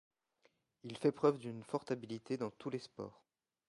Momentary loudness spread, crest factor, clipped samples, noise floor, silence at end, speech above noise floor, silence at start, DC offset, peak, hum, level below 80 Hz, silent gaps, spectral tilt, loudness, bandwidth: 17 LU; 24 dB; under 0.1%; -77 dBFS; 0.55 s; 38 dB; 0.85 s; under 0.1%; -18 dBFS; none; -80 dBFS; none; -7 dB/octave; -39 LUFS; 11.5 kHz